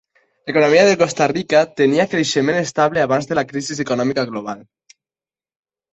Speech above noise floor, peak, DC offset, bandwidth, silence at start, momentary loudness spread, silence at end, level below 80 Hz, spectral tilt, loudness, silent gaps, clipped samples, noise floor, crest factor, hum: over 73 dB; -2 dBFS; under 0.1%; 8.2 kHz; 0.45 s; 12 LU; 1.3 s; -58 dBFS; -4.5 dB/octave; -17 LUFS; none; under 0.1%; under -90 dBFS; 16 dB; none